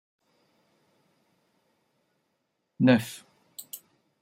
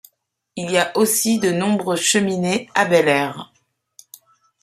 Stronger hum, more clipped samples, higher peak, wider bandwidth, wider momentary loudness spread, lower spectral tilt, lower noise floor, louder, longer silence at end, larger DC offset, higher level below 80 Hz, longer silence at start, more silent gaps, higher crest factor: neither; neither; second, -8 dBFS vs 0 dBFS; about the same, 16 kHz vs 15.5 kHz; first, 23 LU vs 11 LU; first, -6 dB/octave vs -3.5 dB/octave; first, -78 dBFS vs -65 dBFS; second, -24 LUFS vs -18 LUFS; second, 0.45 s vs 1.2 s; neither; second, -74 dBFS vs -64 dBFS; first, 2.8 s vs 0.55 s; neither; about the same, 24 dB vs 20 dB